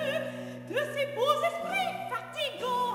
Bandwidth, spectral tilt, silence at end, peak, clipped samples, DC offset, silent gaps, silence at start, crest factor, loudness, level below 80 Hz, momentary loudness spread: 16 kHz; -3.5 dB/octave; 0 s; -12 dBFS; under 0.1%; under 0.1%; none; 0 s; 18 dB; -31 LUFS; -72 dBFS; 8 LU